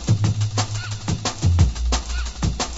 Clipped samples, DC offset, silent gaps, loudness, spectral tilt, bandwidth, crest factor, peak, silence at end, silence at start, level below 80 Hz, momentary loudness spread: under 0.1%; under 0.1%; none; -23 LUFS; -4.5 dB/octave; 8 kHz; 16 dB; -4 dBFS; 0 s; 0 s; -28 dBFS; 7 LU